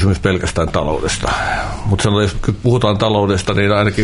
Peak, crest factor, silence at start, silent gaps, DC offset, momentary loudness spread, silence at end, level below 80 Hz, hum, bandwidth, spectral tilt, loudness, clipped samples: -2 dBFS; 14 dB; 0 s; none; under 0.1%; 4 LU; 0 s; -30 dBFS; none; 11 kHz; -5.5 dB/octave; -16 LUFS; under 0.1%